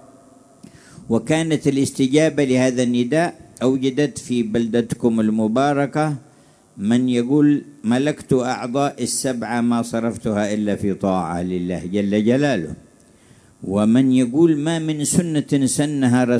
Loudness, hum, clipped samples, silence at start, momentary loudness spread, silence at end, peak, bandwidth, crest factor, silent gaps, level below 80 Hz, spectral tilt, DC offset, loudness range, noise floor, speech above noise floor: -19 LUFS; none; under 0.1%; 1 s; 7 LU; 0 s; -2 dBFS; 11 kHz; 16 dB; none; -54 dBFS; -5.5 dB/octave; under 0.1%; 3 LU; -50 dBFS; 32 dB